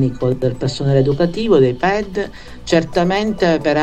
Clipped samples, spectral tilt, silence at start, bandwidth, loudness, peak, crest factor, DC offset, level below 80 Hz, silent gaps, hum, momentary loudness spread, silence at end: under 0.1%; -6.5 dB/octave; 0 s; 9 kHz; -16 LUFS; -2 dBFS; 14 dB; under 0.1%; -38 dBFS; none; none; 9 LU; 0 s